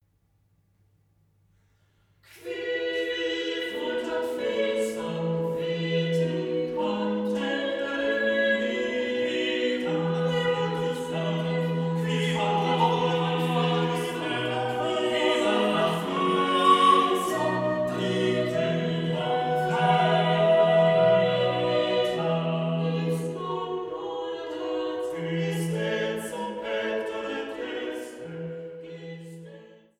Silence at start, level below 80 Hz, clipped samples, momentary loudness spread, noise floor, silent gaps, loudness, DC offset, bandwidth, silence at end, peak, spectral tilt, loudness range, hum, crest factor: 2.35 s; -66 dBFS; under 0.1%; 11 LU; -67 dBFS; none; -26 LUFS; under 0.1%; 14.5 kHz; 0.35 s; -8 dBFS; -6 dB/octave; 8 LU; none; 18 dB